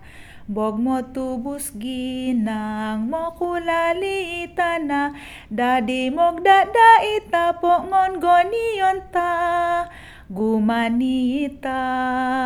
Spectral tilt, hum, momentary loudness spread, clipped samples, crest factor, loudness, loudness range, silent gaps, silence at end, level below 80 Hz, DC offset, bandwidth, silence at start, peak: -4.5 dB/octave; none; 12 LU; under 0.1%; 20 dB; -20 LUFS; 8 LU; none; 0 s; -48 dBFS; under 0.1%; 19.5 kHz; 0 s; 0 dBFS